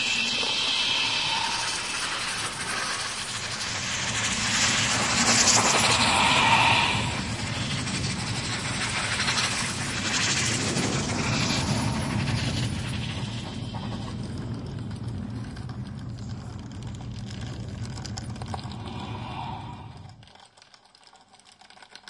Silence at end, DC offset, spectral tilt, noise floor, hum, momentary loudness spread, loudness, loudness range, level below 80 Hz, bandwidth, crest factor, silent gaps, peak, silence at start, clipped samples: 0.1 s; under 0.1%; -2.5 dB/octave; -55 dBFS; none; 17 LU; -25 LUFS; 16 LU; -48 dBFS; 11.5 kHz; 20 dB; none; -6 dBFS; 0 s; under 0.1%